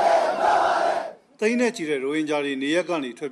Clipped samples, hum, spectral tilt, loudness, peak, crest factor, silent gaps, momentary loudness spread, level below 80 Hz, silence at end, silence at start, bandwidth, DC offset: under 0.1%; none; -4 dB/octave; -23 LUFS; -10 dBFS; 12 dB; none; 8 LU; -66 dBFS; 0 s; 0 s; 12.5 kHz; under 0.1%